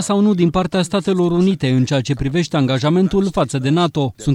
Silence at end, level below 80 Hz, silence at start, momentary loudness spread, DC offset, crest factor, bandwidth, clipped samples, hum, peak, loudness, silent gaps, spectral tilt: 0 s; -40 dBFS; 0 s; 3 LU; under 0.1%; 12 dB; 12 kHz; under 0.1%; none; -4 dBFS; -17 LUFS; none; -6.5 dB/octave